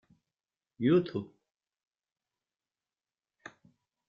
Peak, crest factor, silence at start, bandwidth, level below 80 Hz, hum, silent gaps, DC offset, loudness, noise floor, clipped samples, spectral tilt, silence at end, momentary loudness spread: -16 dBFS; 22 dB; 0.8 s; 7 kHz; -74 dBFS; none; none; under 0.1%; -30 LUFS; under -90 dBFS; under 0.1%; -7 dB/octave; 2.85 s; 25 LU